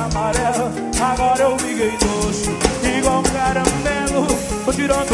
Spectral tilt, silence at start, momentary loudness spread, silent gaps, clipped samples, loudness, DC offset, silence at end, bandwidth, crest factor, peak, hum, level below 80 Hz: -4 dB/octave; 0 s; 3 LU; none; under 0.1%; -18 LUFS; 0.1%; 0 s; 12 kHz; 18 dB; 0 dBFS; none; -30 dBFS